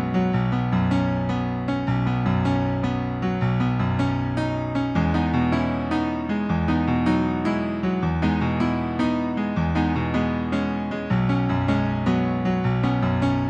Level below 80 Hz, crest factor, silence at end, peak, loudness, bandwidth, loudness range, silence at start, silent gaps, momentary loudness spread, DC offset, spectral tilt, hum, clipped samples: -38 dBFS; 14 dB; 0 s; -8 dBFS; -23 LUFS; 8.4 kHz; 1 LU; 0 s; none; 3 LU; under 0.1%; -8.5 dB/octave; none; under 0.1%